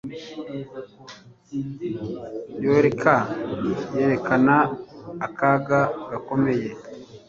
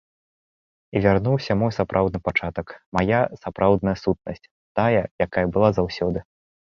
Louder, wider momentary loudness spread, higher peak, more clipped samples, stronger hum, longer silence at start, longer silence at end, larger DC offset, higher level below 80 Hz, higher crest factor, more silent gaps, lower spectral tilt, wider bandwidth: about the same, -22 LUFS vs -22 LUFS; first, 20 LU vs 10 LU; about the same, -2 dBFS vs -2 dBFS; neither; neither; second, 0.05 s vs 0.95 s; second, 0.1 s vs 0.45 s; neither; second, -58 dBFS vs -44 dBFS; about the same, 22 dB vs 20 dB; second, none vs 2.86-2.92 s, 4.51-4.75 s, 5.11-5.19 s; about the same, -7.5 dB/octave vs -8 dB/octave; about the same, 7.4 kHz vs 7.2 kHz